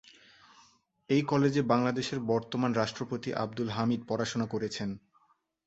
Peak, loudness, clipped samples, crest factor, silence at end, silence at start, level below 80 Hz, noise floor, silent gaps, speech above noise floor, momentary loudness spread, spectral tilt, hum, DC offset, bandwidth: -12 dBFS; -31 LUFS; under 0.1%; 20 dB; 0.7 s; 1.1 s; -66 dBFS; -70 dBFS; none; 40 dB; 8 LU; -6 dB/octave; none; under 0.1%; 8.2 kHz